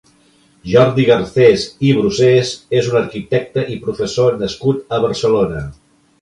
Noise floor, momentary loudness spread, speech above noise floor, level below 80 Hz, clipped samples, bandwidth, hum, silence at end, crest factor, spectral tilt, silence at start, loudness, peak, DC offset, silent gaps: -52 dBFS; 9 LU; 38 dB; -44 dBFS; under 0.1%; 11 kHz; none; 0.5 s; 14 dB; -6 dB/octave; 0.65 s; -15 LUFS; 0 dBFS; under 0.1%; none